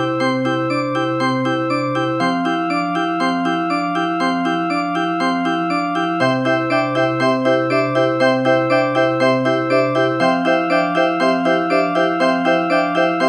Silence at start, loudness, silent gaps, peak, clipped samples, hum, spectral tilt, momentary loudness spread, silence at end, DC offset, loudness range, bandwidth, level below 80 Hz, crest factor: 0 s; -17 LUFS; none; -2 dBFS; under 0.1%; none; -6 dB/octave; 4 LU; 0 s; under 0.1%; 3 LU; 10.5 kHz; -60 dBFS; 16 dB